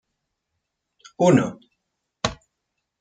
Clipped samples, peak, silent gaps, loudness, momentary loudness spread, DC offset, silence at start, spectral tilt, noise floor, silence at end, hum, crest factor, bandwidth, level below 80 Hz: under 0.1%; -2 dBFS; none; -22 LUFS; 11 LU; under 0.1%; 1.2 s; -6 dB/octave; -79 dBFS; 0.65 s; none; 22 dB; 9.2 kHz; -54 dBFS